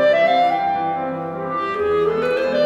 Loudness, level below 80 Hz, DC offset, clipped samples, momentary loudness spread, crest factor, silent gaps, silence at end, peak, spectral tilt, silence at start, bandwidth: -19 LUFS; -56 dBFS; under 0.1%; under 0.1%; 9 LU; 12 dB; none; 0 s; -6 dBFS; -6 dB/octave; 0 s; 9 kHz